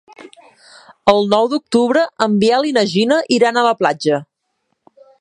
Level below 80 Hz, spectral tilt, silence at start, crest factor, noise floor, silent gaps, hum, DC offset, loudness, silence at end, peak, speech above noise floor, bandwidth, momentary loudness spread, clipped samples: -60 dBFS; -5 dB/octave; 0.2 s; 16 dB; -70 dBFS; none; none; under 0.1%; -15 LUFS; 1 s; 0 dBFS; 56 dB; 11 kHz; 4 LU; under 0.1%